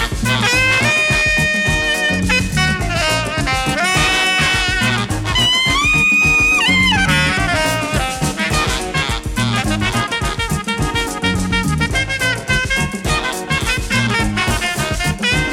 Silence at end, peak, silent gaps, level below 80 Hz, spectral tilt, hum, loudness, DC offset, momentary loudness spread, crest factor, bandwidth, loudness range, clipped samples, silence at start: 0 s; -2 dBFS; none; -28 dBFS; -3.5 dB/octave; none; -15 LUFS; under 0.1%; 7 LU; 14 dB; 17 kHz; 5 LU; under 0.1%; 0 s